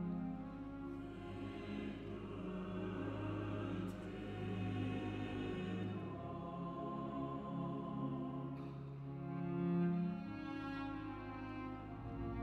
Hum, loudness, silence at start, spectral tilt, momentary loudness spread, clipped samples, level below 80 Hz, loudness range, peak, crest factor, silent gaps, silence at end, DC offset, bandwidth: none; -44 LUFS; 0 s; -8.5 dB/octave; 7 LU; under 0.1%; -60 dBFS; 3 LU; -28 dBFS; 14 dB; none; 0 s; under 0.1%; 8.4 kHz